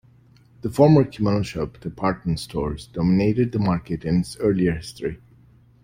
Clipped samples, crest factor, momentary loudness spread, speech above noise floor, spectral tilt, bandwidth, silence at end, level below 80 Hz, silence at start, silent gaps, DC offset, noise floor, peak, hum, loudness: under 0.1%; 20 dB; 14 LU; 32 dB; -7.5 dB/octave; 15.5 kHz; 0.7 s; -44 dBFS; 0.65 s; none; under 0.1%; -53 dBFS; -4 dBFS; none; -22 LUFS